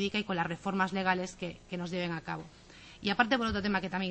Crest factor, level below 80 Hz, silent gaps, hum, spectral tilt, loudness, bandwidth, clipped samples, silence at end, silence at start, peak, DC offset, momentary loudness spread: 22 dB; -56 dBFS; none; none; -5 dB/octave; -33 LUFS; 8.4 kHz; under 0.1%; 0 s; 0 s; -12 dBFS; under 0.1%; 14 LU